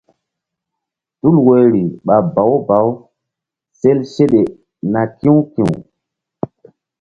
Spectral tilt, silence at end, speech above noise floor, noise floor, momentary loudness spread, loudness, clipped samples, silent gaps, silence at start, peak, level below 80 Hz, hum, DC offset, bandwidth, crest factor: -9.5 dB/octave; 1.2 s; 69 dB; -81 dBFS; 16 LU; -14 LUFS; under 0.1%; none; 1.25 s; 0 dBFS; -52 dBFS; none; under 0.1%; 8.2 kHz; 14 dB